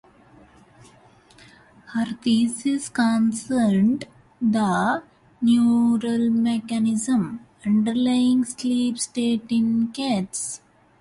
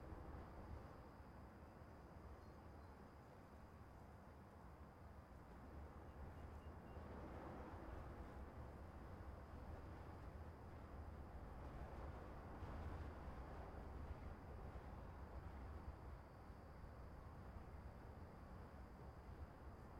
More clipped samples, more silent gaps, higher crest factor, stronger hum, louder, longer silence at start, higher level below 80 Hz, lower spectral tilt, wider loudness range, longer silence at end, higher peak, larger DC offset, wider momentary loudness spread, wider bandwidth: neither; neither; about the same, 14 dB vs 14 dB; neither; first, -22 LUFS vs -58 LUFS; first, 1.9 s vs 0 s; about the same, -60 dBFS vs -60 dBFS; second, -5 dB/octave vs -7.5 dB/octave; second, 3 LU vs 6 LU; first, 0.45 s vs 0 s; first, -10 dBFS vs -42 dBFS; neither; about the same, 9 LU vs 7 LU; second, 11.5 kHz vs 16 kHz